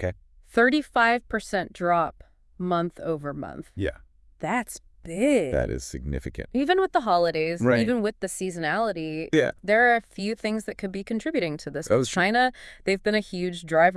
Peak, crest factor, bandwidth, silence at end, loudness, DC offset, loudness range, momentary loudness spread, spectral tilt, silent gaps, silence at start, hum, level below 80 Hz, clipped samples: -6 dBFS; 18 dB; 12 kHz; 0 s; -25 LUFS; under 0.1%; 5 LU; 12 LU; -5 dB/octave; none; 0 s; none; -46 dBFS; under 0.1%